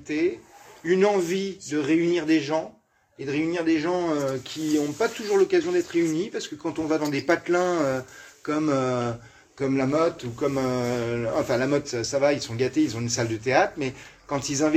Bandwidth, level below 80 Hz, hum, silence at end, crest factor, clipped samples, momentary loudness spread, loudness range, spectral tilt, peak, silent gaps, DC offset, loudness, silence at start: 15.5 kHz; -60 dBFS; none; 0 s; 20 dB; under 0.1%; 9 LU; 2 LU; -5 dB/octave; -4 dBFS; none; under 0.1%; -25 LUFS; 0 s